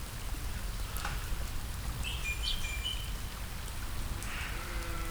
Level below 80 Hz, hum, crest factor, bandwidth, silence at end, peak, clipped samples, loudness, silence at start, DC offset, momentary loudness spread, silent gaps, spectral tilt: -38 dBFS; none; 16 dB; over 20 kHz; 0 s; -20 dBFS; under 0.1%; -38 LUFS; 0 s; under 0.1%; 7 LU; none; -3 dB/octave